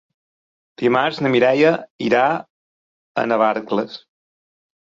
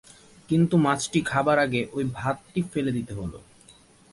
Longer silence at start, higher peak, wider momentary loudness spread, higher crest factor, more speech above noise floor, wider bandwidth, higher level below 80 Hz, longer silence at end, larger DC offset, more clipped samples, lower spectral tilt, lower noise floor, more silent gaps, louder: first, 0.8 s vs 0.5 s; first, -2 dBFS vs -8 dBFS; first, 12 LU vs 9 LU; about the same, 18 dB vs 18 dB; first, over 72 dB vs 30 dB; second, 7.6 kHz vs 11.5 kHz; second, -64 dBFS vs -54 dBFS; first, 0.9 s vs 0.75 s; neither; neither; about the same, -6.5 dB/octave vs -6 dB/octave; first, under -90 dBFS vs -54 dBFS; first, 1.90-1.99 s, 2.50-3.15 s vs none; first, -18 LUFS vs -25 LUFS